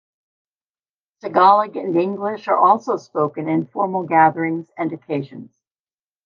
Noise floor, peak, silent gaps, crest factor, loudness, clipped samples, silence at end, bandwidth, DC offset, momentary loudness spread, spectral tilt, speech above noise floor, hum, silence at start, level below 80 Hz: under -90 dBFS; -2 dBFS; none; 18 dB; -19 LUFS; under 0.1%; 0.8 s; 7 kHz; under 0.1%; 13 LU; -7.5 dB/octave; over 72 dB; none; 1.25 s; -76 dBFS